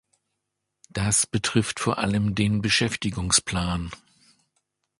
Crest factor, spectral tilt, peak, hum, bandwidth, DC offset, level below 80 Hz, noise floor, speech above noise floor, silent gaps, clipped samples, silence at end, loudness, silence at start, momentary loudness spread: 20 dB; -3.5 dB/octave; -6 dBFS; none; 11.5 kHz; under 0.1%; -44 dBFS; -81 dBFS; 57 dB; none; under 0.1%; 1.05 s; -23 LUFS; 0.95 s; 8 LU